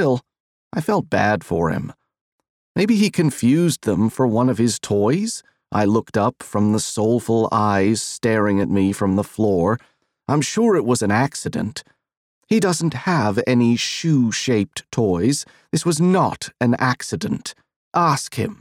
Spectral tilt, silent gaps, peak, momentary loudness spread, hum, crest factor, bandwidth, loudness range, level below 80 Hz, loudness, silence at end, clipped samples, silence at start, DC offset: -5.5 dB/octave; 0.40-0.71 s, 2.21-2.39 s, 2.49-2.75 s, 12.17-12.42 s, 17.76-17.91 s; -4 dBFS; 8 LU; none; 16 dB; 15.5 kHz; 2 LU; -54 dBFS; -19 LUFS; 0.05 s; under 0.1%; 0 s; under 0.1%